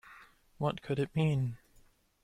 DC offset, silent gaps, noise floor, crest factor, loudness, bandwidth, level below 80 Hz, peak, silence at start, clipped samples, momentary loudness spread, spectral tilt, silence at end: under 0.1%; none; -64 dBFS; 16 dB; -34 LUFS; 10.5 kHz; -62 dBFS; -18 dBFS; 0.05 s; under 0.1%; 17 LU; -8 dB/octave; 0.7 s